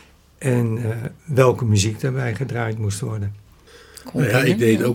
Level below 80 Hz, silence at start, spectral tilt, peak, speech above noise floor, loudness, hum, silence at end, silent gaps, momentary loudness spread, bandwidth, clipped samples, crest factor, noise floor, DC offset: -54 dBFS; 0.4 s; -6 dB/octave; 0 dBFS; 28 dB; -21 LUFS; none; 0 s; none; 12 LU; 17 kHz; under 0.1%; 20 dB; -47 dBFS; under 0.1%